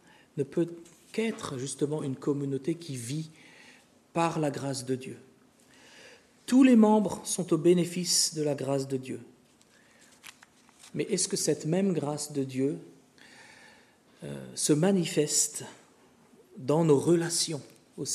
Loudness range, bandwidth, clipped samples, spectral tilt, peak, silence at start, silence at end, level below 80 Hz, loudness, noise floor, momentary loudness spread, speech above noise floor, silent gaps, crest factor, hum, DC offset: 9 LU; 13.5 kHz; under 0.1%; -4.5 dB/octave; -8 dBFS; 0.35 s; 0 s; -74 dBFS; -28 LUFS; -61 dBFS; 17 LU; 33 dB; none; 20 dB; none; under 0.1%